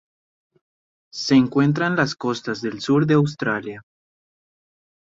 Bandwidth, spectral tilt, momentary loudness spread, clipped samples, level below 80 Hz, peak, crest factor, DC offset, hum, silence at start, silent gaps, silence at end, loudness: 7.8 kHz; -6 dB/octave; 12 LU; under 0.1%; -60 dBFS; -6 dBFS; 18 dB; under 0.1%; none; 1.15 s; none; 1.3 s; -20 LUFS